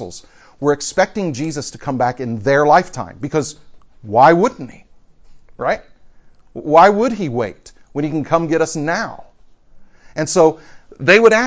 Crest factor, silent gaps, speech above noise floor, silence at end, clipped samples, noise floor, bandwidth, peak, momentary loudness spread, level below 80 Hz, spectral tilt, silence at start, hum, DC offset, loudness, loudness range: 16 dB; none; 30 dB; 0 s; under 0.1%; -45 dBFS; 8 kHz; 0 dBFS; 18 LU; -50 dBFS; -5 dB/octave; 0 s; none; under 0.1%; -16 LUFS; 3 LU